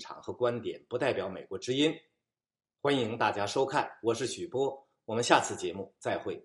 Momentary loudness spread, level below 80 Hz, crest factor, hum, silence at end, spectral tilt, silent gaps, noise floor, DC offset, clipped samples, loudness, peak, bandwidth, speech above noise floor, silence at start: 12 LU; -74 dBFS; 26 dB; none; 0.05 s; -4 dB/octave; none; under -90 dBFS; under 0.1%; under 0.1%; -31 LUFS; -6 dBFS; 11.5 kHz; over 59 dB; 0 s